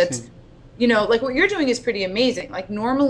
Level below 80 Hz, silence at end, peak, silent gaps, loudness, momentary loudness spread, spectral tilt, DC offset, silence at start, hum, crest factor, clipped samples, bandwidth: -48 dBFS; 0 s; -4 dBFS; none; -21 LUFS; 10 LU; -4 dB/octave; under 0.1%; 0 s; none; 16 dB; under 0.1%; 11 kHz